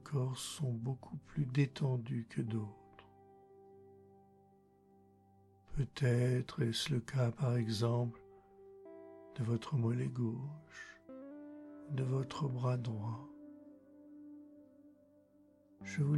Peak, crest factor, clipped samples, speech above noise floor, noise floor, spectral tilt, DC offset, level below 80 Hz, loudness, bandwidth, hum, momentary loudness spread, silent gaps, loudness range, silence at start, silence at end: -20 dBFS; 18 dB; under 0.1%; 31 dB; -67 dBFS; -6.5 dB/octave; under 0.1%; -62 dBFS; -38 LUFS; 12.5 kHz; none; 21 LU; none; 10 LU; 0 s; 0 s